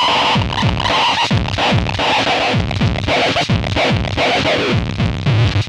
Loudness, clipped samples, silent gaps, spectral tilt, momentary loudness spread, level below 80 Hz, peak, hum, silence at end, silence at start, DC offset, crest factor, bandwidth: -15 LUFS; under 0.1%; none; -5 dB/octave; 4 LU; -30 dBFS; -2 dBFS; none; 0 s; 0 s; under 0.1%; 14 dB; 11 kHz